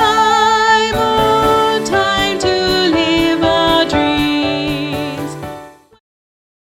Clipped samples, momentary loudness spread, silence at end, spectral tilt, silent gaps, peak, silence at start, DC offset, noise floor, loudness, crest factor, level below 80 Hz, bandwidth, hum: under 0.1%; 11 LU; 1.05 s; -4 dB/octave; none; -2 dBFS; 0 s; under 0.1%; -34 dBFS; -13 LUFS; 14 dB; -36 dBFS; 18 kHz; none